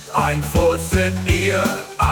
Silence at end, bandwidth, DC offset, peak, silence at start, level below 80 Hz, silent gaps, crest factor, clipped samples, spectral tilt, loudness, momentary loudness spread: 0 s; 19.5 kHz; under 0.1%; -4 dBFS; 0 s; -30 dBFS; none; 16 dB; under 0.1%; -5 dB/octave; -19 LUFS; 3 LU